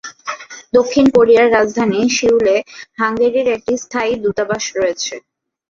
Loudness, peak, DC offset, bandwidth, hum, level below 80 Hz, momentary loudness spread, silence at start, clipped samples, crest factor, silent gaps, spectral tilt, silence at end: -15 LUFS; 0 dBFS; under 0.1%; 7.4 kHz; none; -50 dBFS; 16 LU; 0.05 s; under 0.1%; 14 dB; none; -4 dB/octave; 0.55 s